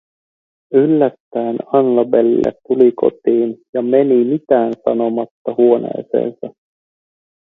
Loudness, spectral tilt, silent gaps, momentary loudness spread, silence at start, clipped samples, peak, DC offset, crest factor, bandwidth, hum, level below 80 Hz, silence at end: -15 LUFS; -10 dB/octave; 1.20-1.31 s, 3.69-3.73 s, 5.31-5.45 s; 9 LU; 0.7 s; under 0.1%; 0 dBFS; under 0.1%; 16 dB; 3.9 kHz; none; -58 dBFS; 1.05 s